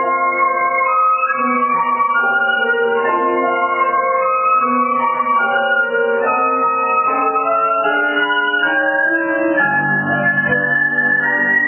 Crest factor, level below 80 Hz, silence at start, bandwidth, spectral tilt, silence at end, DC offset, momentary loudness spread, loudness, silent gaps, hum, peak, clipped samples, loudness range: 12 dB; -62 dBFS; 0 s; 3.2 kHz; -8 dB/octave; 0 s; under 0.1%; 2 LU; -15 LUFS; none; none; -4 dBFS; under 0.1%; 1 LU